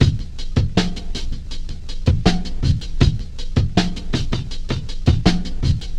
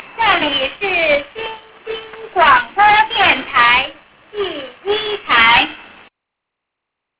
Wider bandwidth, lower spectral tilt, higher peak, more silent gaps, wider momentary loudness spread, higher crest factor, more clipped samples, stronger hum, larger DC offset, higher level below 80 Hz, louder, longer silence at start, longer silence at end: first, 9.8 kHz vs 4 kHz; about the same, -6 dB/octave vs -5.5 dB/octave; about the same, 0 dBFS vs 0 dBFS; neither; second, 11 LU vs 17 LU; about the same, 18 dB vs 16 dB; neither; neither; neither; first, -24 dBFS vs -46 dBFS; second, -21 LUFS vs -13 LUFS; about the same, 0 s vs 0 s; second, 0 s vs 1.35 s